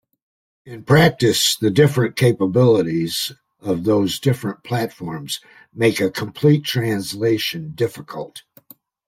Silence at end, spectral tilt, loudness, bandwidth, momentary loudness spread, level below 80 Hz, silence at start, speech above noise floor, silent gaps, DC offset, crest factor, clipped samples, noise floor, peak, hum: 0.7 s; -5 dB/octave; -18 LUFS; 16.5 kHz; 14 LU; -54 dBFS; 0.65 s; 30 dB; none; under 0.1%; 18 dB; under 0.1%; -49 dBFS; -2 dBFS; none